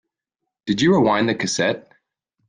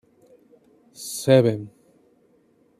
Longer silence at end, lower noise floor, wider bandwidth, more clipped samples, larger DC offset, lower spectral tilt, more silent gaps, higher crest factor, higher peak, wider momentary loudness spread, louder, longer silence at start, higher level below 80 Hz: second, 0.7 s vs 1.1 s; first, -82 dBFS vs -61 dBFS; second, 10 kHz vs 14.5 kHz; neither; neither; second, -4.5 dB/octave vs -6 dB/octave; neither; second, 16 dB vs 22 dB; about the same, -4 dBFS vs -4 dBFS; second, 13 LU vs 20 LU; about the same, -19 LUFS vs -21 LUFS; second, 0.65 s vs 1 s; first, -58 dBFS vs -68 dBFS